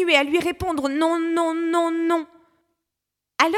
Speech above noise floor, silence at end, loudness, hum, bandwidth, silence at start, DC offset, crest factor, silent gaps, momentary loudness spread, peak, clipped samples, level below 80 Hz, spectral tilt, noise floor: 63 dB; 0 s; -22 LUFS; none; 14.5 kHz; 0 s; under 0.1%; 22 dB; none; 7 LU; 0 dBFS; under 0.1%; -52 dBFS; -3.5 dB/octave; -84 dBFS